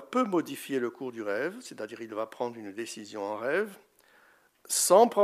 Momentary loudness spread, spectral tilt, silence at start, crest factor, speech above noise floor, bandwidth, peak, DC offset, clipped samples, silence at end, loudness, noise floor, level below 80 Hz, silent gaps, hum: 16 LU; -3 dB/octave; 0 s; 22 dB; 34 dB; 15.5 kHz; -8 dBFS; under 0.1%; under 0.1%; 0 s; -30 LUFS; -63 dBFS; -86 dBFS; none; none